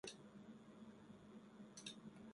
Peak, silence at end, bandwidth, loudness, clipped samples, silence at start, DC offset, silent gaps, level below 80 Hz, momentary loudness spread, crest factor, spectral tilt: -36 dBFS; 0 s; 11.5 kHz; -59 LUFS; under 0.1%; 0.05 s; under 0.1%; none; -84 dBFS; 7 LU; 22 dB; -3.5 dB/octave